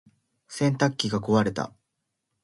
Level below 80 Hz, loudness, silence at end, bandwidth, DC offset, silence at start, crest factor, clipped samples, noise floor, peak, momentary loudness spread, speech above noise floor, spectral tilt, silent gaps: -60 dBFS; -25 LUFS; 0.75 s; 11.5 kHz; under 0.1%; 0.5 s; 20 dB; under 0.1%; -80 dBFS; -8 dBFS; 12 LU; 56 dB; -5.5 dB/octave; none